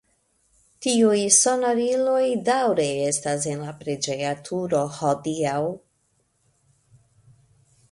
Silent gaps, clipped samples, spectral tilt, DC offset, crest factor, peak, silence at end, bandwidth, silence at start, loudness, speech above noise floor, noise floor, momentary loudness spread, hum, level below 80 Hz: none; under 0.1%; -3.5 dB/octave; under 0.1%; 20 dB; -4 dBFS; 2.15 s; 11.5 kHz; 0.8 s; -22 LUFS; 46 dB; -68 dBFS; 13 LU; none; -66 dBFS